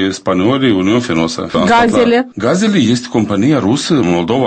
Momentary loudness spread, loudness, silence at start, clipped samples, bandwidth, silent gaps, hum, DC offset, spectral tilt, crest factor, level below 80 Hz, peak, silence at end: 5 LU; -12 LUFS; 0 s; under 0.1%; 8.8 kHz; none; none; under 0.1%; -5.5 dB/octave; 12 dB; -44 dBFS; 0 dBFS; 0 s